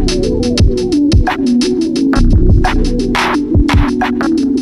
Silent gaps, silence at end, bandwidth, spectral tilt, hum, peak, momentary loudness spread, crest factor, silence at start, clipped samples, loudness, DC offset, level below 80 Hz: none; 0 s; 12 kHz; -6 dB/octave; none; 0 dBFS; 3 LU; 10 dB; 0 s; under 0.1%; -12 LUFS; under 0.1%; -16 dBFS